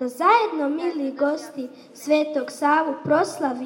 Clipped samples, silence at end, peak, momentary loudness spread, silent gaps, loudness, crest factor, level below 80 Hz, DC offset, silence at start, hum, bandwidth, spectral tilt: under 0.1%; 0 s; -4 dBFS; 15 LU; none; -22 LUFS; 18 dB; -82 dBFS; under 0.1%; 0 s; none; 17 kHz; -4.5 dB/octave